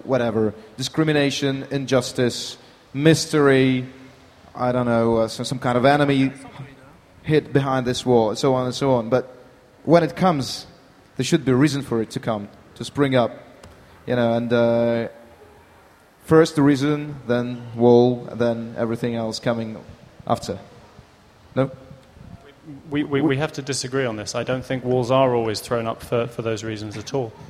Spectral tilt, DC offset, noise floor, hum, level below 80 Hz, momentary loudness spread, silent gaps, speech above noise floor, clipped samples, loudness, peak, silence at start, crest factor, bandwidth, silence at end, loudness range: -6 dB/octave; under 0.1%; -51 dBFS; none; -54 dBFS; 16 LU; none; 31 dB; under 0.1%; -21 LUFS; -2 dBFS; 0.05 s; 20 dB; 15 kHz; 0.05 s; 7 LU